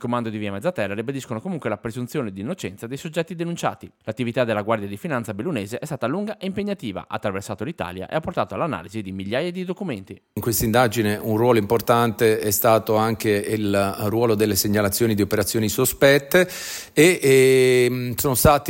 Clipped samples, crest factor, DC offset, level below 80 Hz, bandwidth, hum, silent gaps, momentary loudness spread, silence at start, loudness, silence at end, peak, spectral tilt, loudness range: under 0.1%; 18 dB; under 0.1%; -48 dBFS; 17 kHz; none; none; 13 LU; 0 s; -21 LUFS; 0 s; -4 dBFS; -5 dB/octave; 10 LU